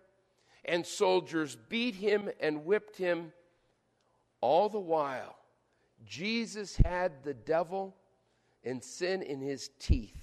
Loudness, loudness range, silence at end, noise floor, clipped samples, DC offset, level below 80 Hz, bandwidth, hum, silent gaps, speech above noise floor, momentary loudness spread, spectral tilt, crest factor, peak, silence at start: -33 LUFS; 3 LU; 0 s; -74 dBFS; under 0.1%; under 0.1%; -42 dBFS; 13 kHz; none; none; 42 dB; 12 LU; -5.5 dB/octave; 24 dB; -8 dBFS; 0.65 s